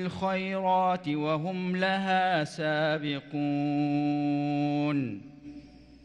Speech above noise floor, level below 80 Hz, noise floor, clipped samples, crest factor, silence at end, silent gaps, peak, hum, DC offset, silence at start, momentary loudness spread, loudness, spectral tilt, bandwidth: 21 dB; -66 dBFS; -49 dBFS; under 0.1%; 14 dB; 0.1 s; none; -14 dBFS; none; under 0.1%; 0 s; 9 LU; -28 LUFS; -7 dB/octave; 9.8 kHz